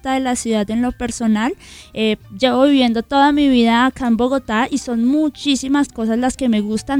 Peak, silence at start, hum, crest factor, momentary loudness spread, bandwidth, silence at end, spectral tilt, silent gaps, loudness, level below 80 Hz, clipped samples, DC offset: 0 dBFS; 0.05 s; none; 16 dB; 7 LU; 14 kHz; 0 s; -4.5 dB/octave; none; -17 LUFS; -42 dBFS; under 0.1%; under 0.1%